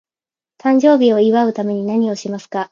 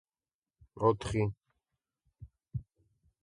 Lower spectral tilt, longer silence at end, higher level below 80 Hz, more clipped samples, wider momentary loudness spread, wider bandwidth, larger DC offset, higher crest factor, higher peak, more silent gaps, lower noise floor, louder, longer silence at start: about the same, -6.5 dB/octave vs -7 dB/octave; second, 0.05 s vs 0.6 s; second, -70 dBFS vs -56 dBFS; neither; second, 12 LU vs 15 LU; second, 7.4 kHz vs 11.5 kHz; neither; second, 16 dB vs 24 dB; first, 0 dBFS vs -12 dBFS; neither; about the same, under -90 dBFS vs under -90 dBFS; first, -15 LUFS vs -34 LUFS; about the same, 0.65 s vs 0.75 s